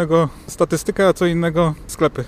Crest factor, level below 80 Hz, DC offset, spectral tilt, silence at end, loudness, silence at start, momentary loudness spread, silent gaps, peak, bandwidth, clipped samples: 14 dB; -40 dBFS; under 0.1%; -6 dB/octave; 0 s; -18 LUFS; 0 s; 5 LU; none; -4 dBFS; 15.5 kHz; under 0.1%